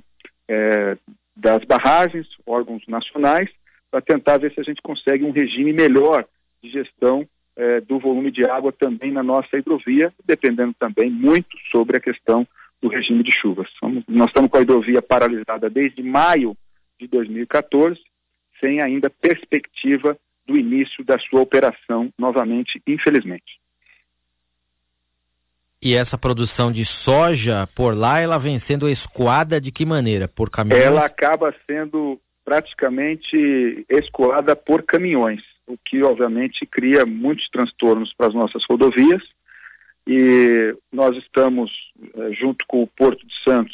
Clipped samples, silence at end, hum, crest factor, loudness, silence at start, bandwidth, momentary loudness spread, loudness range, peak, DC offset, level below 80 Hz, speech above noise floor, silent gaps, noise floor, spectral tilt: under 0.1%; 0 s; 60 Hz at -50 dBFS; 12 dB; -18 LUFS; 0.5 s; 4 kHz; 10 LU; 4 LU; -6 dBFS; under 0.1%; -48 dBFS; 57 dB; none; -74 dBFS; -10 dB/octave